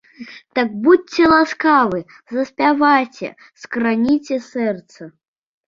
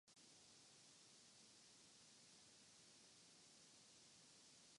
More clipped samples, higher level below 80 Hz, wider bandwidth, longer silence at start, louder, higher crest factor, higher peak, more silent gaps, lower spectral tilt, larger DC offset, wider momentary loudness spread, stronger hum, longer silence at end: neither; first, -54 dBFS vs under -90 dBFS; second, 7.6 kHz vs 11.5 kHz; first, 0.2 s vs 0.05 s; first, -17 LUFS vs -66 LUFS; about the same, 16 dB vs 14 dB; first, -2 dBFS vs -56 dBFS; neither; first, -5.5 dB/octave vs -1 dB/octave; neither; first, 15 LU vs 0 LU; neither; first, 0.6 s vs 0 s